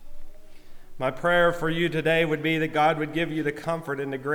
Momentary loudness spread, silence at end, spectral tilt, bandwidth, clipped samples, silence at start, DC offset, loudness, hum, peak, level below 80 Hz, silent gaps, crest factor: 9 LU; 0 s; -6 dB/octave; 19 kHz; under 0.1%; 0 s; under 0.1%; -25 LUFS; none; -10 dBFS; -44 dBFS; none; 16 dB